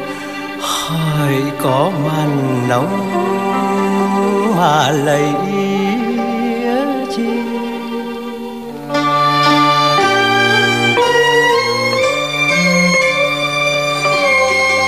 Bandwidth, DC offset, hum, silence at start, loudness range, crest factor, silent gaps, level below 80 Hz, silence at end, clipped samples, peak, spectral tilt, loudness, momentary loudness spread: 16 kHz; 0.5%; none; 0 s; 6 LU; 12 dB; none; -54 dBFS; 0 s; under 0.1%; -2 dBFS; -4.5 dB/octave; -14 LUFS; 10 LU